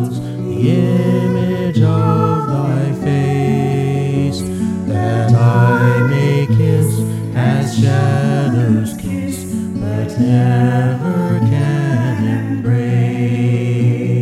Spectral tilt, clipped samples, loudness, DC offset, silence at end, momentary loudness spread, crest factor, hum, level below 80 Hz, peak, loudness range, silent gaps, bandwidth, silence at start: -8 dB/octave; under 0.1%; -15 LUFS; under 0.1%; 0 s; 7 LU; 14 dB; none; -46 dBFS; 0 dBFS; 2 LU; none; 13.5 kHz; 0 s